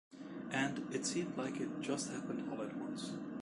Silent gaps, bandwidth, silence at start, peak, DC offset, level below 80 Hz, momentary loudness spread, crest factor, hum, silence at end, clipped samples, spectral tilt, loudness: none; 11.5 kHz; 0.1 s; -22 dBFS; under 0.1%; -76 dBFS; 6 LU; 18 dB; none; 0 s; under 0.1%; -4 dB/octave; -41 LUFS